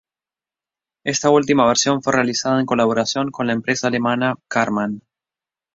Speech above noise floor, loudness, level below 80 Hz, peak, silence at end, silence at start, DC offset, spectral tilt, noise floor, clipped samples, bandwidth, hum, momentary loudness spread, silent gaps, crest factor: over 72 dB; -18 LUFS; -58 dBFS; -2 dBFS; 0.75 s; 1.05 s; under 0.1%; -4 dB/octave; under -90 dBFS; under 0.1%; 7.8 kHz; none; 8 LU; none; 18 dB